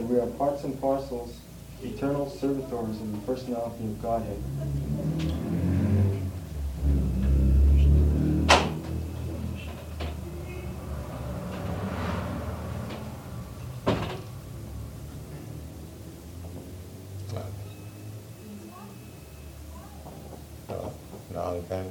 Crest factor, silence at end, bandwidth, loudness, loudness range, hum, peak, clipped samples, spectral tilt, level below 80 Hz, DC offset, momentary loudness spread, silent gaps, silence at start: 26 dB; 0 s; 16.5 kHz; -29 LUFS; 17 LU; none; -4 dBFS; under 0.1%; -6.5 dB/octave; -32 dBFS; under 0.1%; 20 LU; none; 0 s